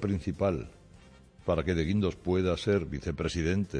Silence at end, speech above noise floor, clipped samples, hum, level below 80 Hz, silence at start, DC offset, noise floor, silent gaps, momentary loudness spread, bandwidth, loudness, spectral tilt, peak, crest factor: 0 s; 26 dB; under 0.1%; none; -46 dBFS; 0 s; under 0.1%; -55 dBFS; none; 8 LU; 10 kHz; -30 LUFS; -7 dB/octave; -14 dBFS; 16 dB